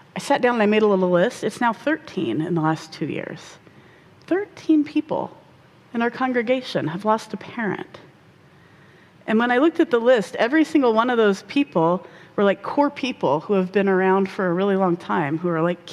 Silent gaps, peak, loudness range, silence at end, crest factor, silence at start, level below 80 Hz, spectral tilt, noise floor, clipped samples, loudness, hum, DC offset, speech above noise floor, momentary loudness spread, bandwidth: none; -6 dBFS; 6 LU; 0 s; 16 dB; 0.15 s; -66 dBFS; -6.5 dB/octave; -51 dBFS; under 0.1%; -21 LUFS; none; under 0.1%; 31 dB; 10 LU; 12.5 kHz